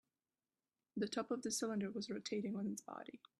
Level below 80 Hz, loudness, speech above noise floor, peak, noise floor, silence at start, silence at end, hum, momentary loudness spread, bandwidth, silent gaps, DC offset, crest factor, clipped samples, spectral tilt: -84 dBFS; -43 LUFS; over 47 dB; -28 dBFS; under -90 dBFS; 0.95 s; 0.2 s; none; 10 LU; 13 kHz; none; under 0.1%; 18 dB; under 0.1%; -4 dB/octave